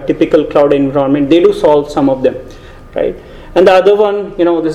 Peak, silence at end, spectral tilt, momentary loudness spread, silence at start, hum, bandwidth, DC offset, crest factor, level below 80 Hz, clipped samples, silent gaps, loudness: 0 dBFS; 0 s; -7 dB/octave; 10 LU; 0 s; none; 11.5 kHz; under 0.1%; 10 dB; -36 dBFS; 0.6%; none; -11 LUFS